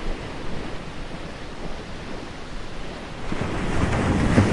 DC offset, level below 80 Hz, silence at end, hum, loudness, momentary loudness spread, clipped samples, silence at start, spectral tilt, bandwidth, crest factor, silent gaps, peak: under 0.1%; -32 dBFS; 0 s; none; -28 LUFS; 14 LU; under 0.1%; 0 s; -6.5 dB/octave; 11.5 kHz; 22 dB; none; -2 dBFS